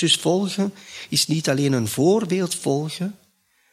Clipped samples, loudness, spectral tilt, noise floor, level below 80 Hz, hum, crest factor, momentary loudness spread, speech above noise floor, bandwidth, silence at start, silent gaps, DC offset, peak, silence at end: under 0.1%; -21 LUFS; -4.5 dB/octave; -63 dBFS; -64 dBFS; none; 18 dB; 10 LU; 41 dB; 15.5 kHz; 0 s; none; under 0.1%; -4 dBFS; 0.55 s